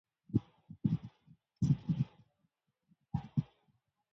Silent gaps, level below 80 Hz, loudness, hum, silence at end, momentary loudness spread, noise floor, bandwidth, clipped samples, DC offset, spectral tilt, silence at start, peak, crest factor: none; -60 dBFS; -37 LUFS; none; 0.7 s; 15 LU; -81 dBFS; 7.6 kHz; under 0.1%; under 0.1%; -9.5 dB/octave; 0.3 s; -16 dBFS; 22 dB